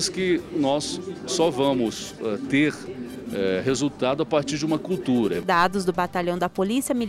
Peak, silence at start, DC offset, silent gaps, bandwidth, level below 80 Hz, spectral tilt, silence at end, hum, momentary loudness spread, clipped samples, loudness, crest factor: -8 dBFS; 0 s; under 0.1%; none; 15.5 kHz; -54 dBFS; -4.5 dB/octave; 0 s; none; 8 LU; under 0.1%; -24 LUFS; 16 dB